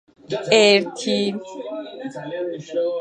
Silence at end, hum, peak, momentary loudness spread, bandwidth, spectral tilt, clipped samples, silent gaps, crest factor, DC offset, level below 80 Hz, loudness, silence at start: 0 s; none; -2 dBFS; 18 LU; 9.6 kHz; -3.5 dB/octave; under 0.1%; none; 18 dB; under 0.1%; -70 dBFS; -20 LUFS; 0.3 s